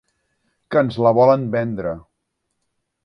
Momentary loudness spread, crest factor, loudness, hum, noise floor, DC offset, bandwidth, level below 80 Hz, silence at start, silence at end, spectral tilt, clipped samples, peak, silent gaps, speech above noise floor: 13 LU; 18 dB; -18 LUFS; none; -75 dBFS; under 0.1%; 6 kHz; -54 dBFS; 0.7 s; 1.05 s; -9 dB/octave; under 0.1%; -2 dBFS; none; 58 dB